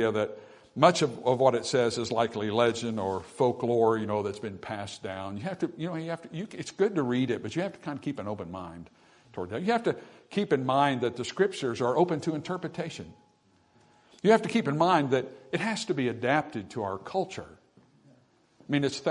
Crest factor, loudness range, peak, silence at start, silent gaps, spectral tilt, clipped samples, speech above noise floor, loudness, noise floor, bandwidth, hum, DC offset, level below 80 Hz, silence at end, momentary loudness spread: 24 dB; 6 LU; -6 dBFS; 0 s; none; -5.5 dB/octave; under 0.1%; 37 dB; -29 LUFS; -65 dBFS; 11 kHz; none; under 0.1%; -70 dBFS; 0 s; 13 LU